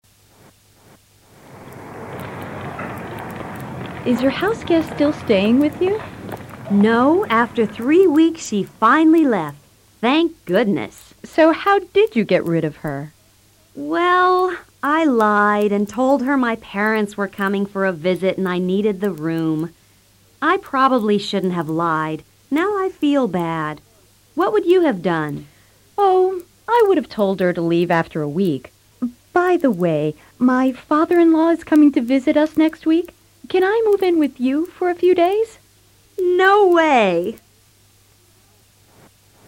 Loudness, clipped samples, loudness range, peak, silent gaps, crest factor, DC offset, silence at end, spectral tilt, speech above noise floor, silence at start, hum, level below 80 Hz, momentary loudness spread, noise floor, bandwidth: -17 LUFS; under 0.1%; 5 LU; -4 dBFS; none; 14 dB; under 0.1%; 2.1 s; -6.5 dB/octave; 37 dB; 1.55 s; none; -56 dBFS; 16 LU; -53 dBFS; 16.5 kHz